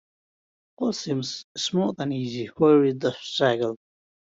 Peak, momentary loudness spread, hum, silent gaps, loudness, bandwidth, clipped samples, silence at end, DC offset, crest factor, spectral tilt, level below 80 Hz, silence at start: -6 dBFS; 11 LU; none; 1.44-1.55 s; -24 LUFS; 7.8 kHz; under 0.1%; 0.55 s; under 0.1%; 18 dB; -5.5 dB/octave; -68 dBFS; 0.8 s